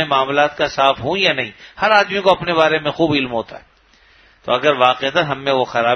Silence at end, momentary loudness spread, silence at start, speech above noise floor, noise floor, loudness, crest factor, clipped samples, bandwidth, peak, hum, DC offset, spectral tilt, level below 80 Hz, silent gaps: 0 s; 9 LU; 0 s; 35 dB; -52 dBFS; -16 LUFS; 16 dB; under 0.1%; 6.6 kHz; 0 dBFS; none; under 0.1%; -4.5 dB/octave; -52 dBFS; none